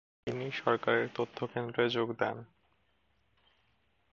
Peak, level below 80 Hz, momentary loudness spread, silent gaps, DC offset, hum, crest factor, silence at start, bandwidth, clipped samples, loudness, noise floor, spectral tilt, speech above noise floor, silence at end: -12 dBFS; -74 dBFS; 8 LU; none; under 0.1%; none; 24 dB; 0.25 s; 7.2 kHz; under 0.1%; -33 LUFS; -75 dBFS; -6.5 dB/octave; 42 dB; 1.7 s